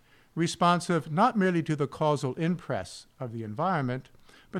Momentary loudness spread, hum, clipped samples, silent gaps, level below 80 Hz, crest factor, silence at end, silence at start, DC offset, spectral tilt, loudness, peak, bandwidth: 14 LU; none; under 0.1%; none; -62 dBFS; 18 dB; 0 s; 0.35 s; under 0.1%; -6 dB/octave; -28 LUFS; -12 dBFS; 13 kHz